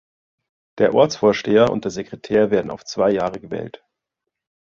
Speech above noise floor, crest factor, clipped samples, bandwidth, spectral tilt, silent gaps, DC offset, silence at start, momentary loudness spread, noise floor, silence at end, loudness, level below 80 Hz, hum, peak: 63 dB; 18 dB; under 0.1%; 7.6 kHz; -5.5 dB/octave; none; under 0.1%; 0.75 s; 14 LU; -82 dBFS; 0.9 s; -19 LUFS; -54 dBFS; none; -2 dBFS